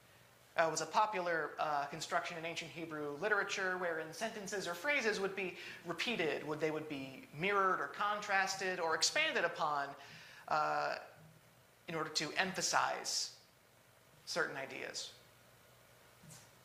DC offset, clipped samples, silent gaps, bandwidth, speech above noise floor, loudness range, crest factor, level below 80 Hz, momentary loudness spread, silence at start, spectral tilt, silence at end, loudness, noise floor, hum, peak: under 0.1%; under 0.1%; none; 15.5 kHz; 29 dB; 4 LU; 24 dB; -80 dBFS; 12 LU; 0.55 s; -2 dB/octave; 0.2 s; -37 LUFS; -66 dBFS; none; -16 dBFS